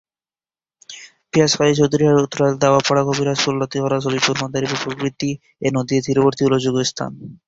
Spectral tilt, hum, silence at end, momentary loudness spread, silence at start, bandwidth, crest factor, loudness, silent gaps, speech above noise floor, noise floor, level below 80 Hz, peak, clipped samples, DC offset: -5 dB/octave; none; 0.1 s; 10 LU; 0.9 s; 8 kHz; 16 dB; -18 LUFS; none; over 72 dB; under -90 dBFS; -54 dBFS; -2 dBFS; under 0.1%; under 0.1%